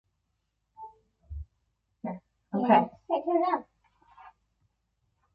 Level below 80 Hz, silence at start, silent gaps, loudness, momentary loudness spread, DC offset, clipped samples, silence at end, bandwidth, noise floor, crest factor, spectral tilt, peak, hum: -54 dBFS; 0.8 s; none; -28 LUFS; 26 LU; under 0.1%; under 0.1%; 1.05 s; 5.2 kHz; -79 dBFS; 24 dB; -9.5 dB/octave; -8 dBFS; none